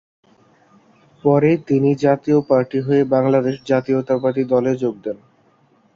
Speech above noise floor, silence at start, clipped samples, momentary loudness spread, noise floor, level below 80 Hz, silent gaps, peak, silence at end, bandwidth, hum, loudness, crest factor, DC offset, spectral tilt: 40 dB; 1.25 s; under 0.1%; 6 LU; -57 dBFS; -60 dBFS; none; -2 dBFS; 0.8 s; 7.4 kHz; none; -18 LUFS; 16 dB; under 0.1%; -8.5 dB/octave